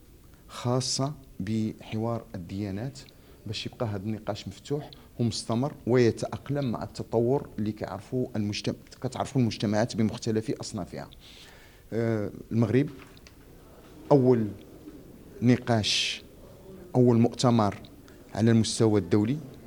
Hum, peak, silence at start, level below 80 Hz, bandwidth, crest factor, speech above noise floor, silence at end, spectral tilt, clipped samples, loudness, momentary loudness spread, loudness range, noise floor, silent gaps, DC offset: none; -6 dBFS; 0.5 s; -56 dBFS; 19 kHz; 22 dB; 25 dB; 0 s; -6 dB/octave; under 0.1%; -28 LUFS; 20 LU; 7 LU; -52 dBFS; none; under 0.1%